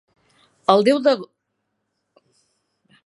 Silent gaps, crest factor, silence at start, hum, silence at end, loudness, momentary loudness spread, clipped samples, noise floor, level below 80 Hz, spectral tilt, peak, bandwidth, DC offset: none; 22 dB; 0.7 s; none; 1.8 s; -18 LUFS; 11 LU; under 0.1%; -75 dBFS; -74 dBFS; -5.5 dB/octave; 0 dBFS; 11.5 kHz; under 0.1%